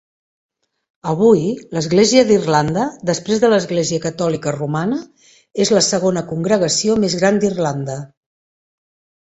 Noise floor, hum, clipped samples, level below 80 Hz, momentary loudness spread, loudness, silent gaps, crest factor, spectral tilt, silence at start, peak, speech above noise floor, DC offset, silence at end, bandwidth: under -90 dBFS; none; under 0.1%; -52 dBFS; 10 LU; -16 LUFS; none; 18 dB; -4.5 dB/octave; 1.05 s; 0 dBFS; over 74 dB; under 0.1%; 1.2 s; 8.4 kHz